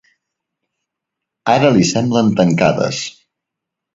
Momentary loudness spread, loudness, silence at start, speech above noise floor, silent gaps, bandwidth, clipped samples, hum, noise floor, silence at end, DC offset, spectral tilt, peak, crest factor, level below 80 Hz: 12 LU; -14 LUFS; 1.45 s; 68 dB; none; 7.8 kHz; under 0.1%; none; -81 dBFS; 0.85 s; under 0.1%; -5.5 dB/octave; 0 dBFS; 16 dB; -52 dBFS